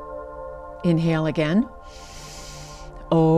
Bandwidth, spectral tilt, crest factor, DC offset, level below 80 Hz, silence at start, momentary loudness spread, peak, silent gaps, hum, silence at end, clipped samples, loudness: 11 kHz; -7.5 dB/octave; 14 dB; under 0.1%; -44 dBFS; 0 s; 19 LU; -8 dBFS; none; none; 0 s; under 0.1%; -23 LUFS